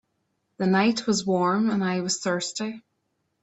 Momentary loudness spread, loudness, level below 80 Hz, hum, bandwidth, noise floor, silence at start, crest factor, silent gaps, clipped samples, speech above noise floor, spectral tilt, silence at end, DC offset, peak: 10 LU; -24 LUFS; -66 dBFS; none; 8.4 kHz; -75 dBFS; 0.6 s; 18 dB; none; under 0.1%; 51 dB; -4.5 dB/octave; 0.65 s; under 0.1%; -8 dBFS